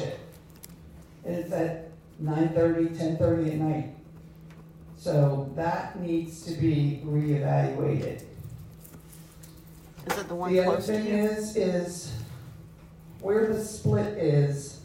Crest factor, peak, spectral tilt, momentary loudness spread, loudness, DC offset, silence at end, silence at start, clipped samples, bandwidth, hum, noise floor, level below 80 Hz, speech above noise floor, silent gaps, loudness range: 18 dB; -12 dBFS; -7 dB/octave; 24 LU; -28 LUFS; under 0.1%; 0 s; 0 s; under 0.1%; 16 kHz; none; -48 dBFS; -56 dBFS; 22 dB; none; 3 LU